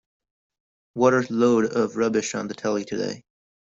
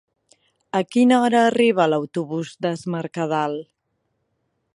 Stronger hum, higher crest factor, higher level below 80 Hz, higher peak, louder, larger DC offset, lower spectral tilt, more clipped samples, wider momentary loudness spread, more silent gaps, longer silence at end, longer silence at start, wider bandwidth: neither; about the same, 20 dB vs 18 dB; about the same, -66 dBFS vs -70 dBFS; about the same, -4 dBFS vs -4 dBFS; second, -23 LUFS vs -20 LUFS; neither; about the same, -5 dB/octave vs -6 dB/octave; neither; about the same, 11 LU vs 11 LU; neither; second, 0.45 s vs 1.1 s; first, 0.95 s vs 0.75 s; second, 7.8 kHz vs 11.5 kHz